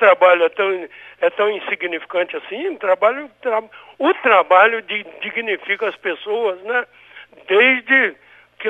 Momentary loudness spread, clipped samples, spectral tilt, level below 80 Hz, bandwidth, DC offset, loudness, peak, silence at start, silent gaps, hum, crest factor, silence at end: 13 LU; under 0.1%; -4.5 dB/octave; -72 dBFS; 4 kHz; under 0.1%; -17 LUFS; 0 dBFS; 0 s; none; none; 18 dB; 0 s